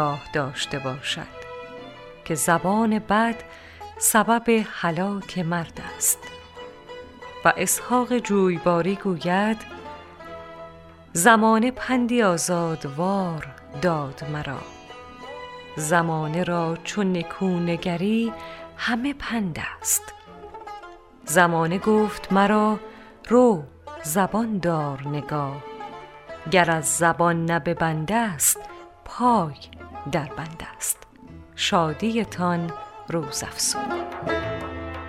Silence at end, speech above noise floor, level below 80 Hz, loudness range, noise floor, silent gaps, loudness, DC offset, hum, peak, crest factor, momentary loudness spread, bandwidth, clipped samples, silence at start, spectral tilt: 0 s; 22 dB; -52 dBFS; 5 LU; -45 dBFS; none; -23 LUFS; under 0.1%; none; -2 dBFS; 22 dB; 20 LU; 16 kHz; under 0.1%; 0 s; -4 dB/octave